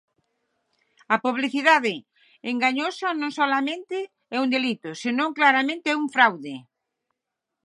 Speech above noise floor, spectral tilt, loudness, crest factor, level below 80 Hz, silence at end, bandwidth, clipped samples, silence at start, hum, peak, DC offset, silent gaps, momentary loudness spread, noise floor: 61 dB; -3.5 dB/octave; -23 LUFS; 22 dB; -82 dBFS; 1.05 s; 11 kHz; under 0.1%; 1.1 s; none; -2 dBFS; under 0.1%; none; 13 LU; -84 dBFS